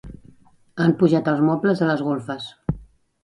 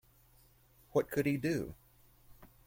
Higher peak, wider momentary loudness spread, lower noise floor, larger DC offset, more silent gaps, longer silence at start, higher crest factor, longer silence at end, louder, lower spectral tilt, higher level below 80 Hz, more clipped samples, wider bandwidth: first, -4 dBFS vs -18 dBFS; first, 13 LU vs 6 LU; second, -52 dBFS vs -65 dBFS; neither; neither; second, 0.05 s vs 0.95 s; about the same, 18 dB vs 20 dB; first, 0.4 s vs 0.2 s; first, -21 LUFS vs -35 LUFS; first, -8 dB/octave vs -6.5 dB/octave; first, -46 dBFS vs -62 dBFS; neither; second, 11 kHz vs 16.5 kHz